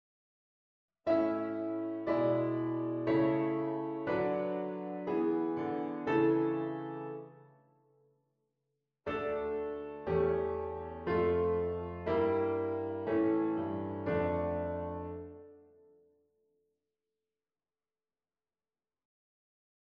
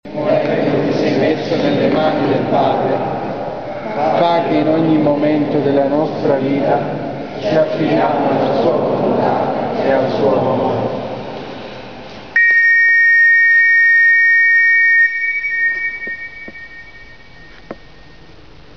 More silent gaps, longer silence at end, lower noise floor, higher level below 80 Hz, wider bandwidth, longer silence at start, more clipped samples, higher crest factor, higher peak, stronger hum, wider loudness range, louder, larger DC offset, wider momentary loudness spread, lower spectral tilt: neither; first, 4.25 s vs 1 s; first, under -90 dBFS vs -41 dBFS; second, -60 dBFS vs -50 dBFS; second, 5.2 kHz vs 6.6 kHz; first, 1.05 s vs 0.05 s; neither; about the same, 16 dB vs 12 dB; second, -18 dBFS vs -4 dBFS; neither; about the same, 8 LU vs 8 LU; second, -34 LUFS vs -13 LUFS; second, under 0.1% vs 0.9%; second, 10 LU vs 17 LU; first, -10 dB/octave vs -4 dB/octave